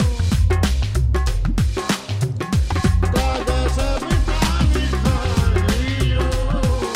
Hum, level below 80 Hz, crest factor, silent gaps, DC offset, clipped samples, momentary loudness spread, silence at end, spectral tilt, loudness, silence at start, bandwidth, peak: none; -20 dBFS; 12 dB; none; under 0.1%; under 0.1%; 3 LU; 0 s; -5.5 dB/octave; -20 LUFS; 0 s; 15.5 kHz; -6 dBFS